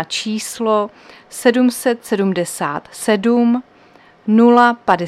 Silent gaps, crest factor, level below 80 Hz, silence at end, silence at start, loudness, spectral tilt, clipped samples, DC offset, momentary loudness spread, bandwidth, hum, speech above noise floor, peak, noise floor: none; 16 dB; -62 dBFS; 0 s; 0 s; -16 LUFS; -4.5 dB/octave; under 0.1%; under 0.1%; 12 LU; 14.5 kHz; none; 32 dB; 0 dBFS; -47 dBFS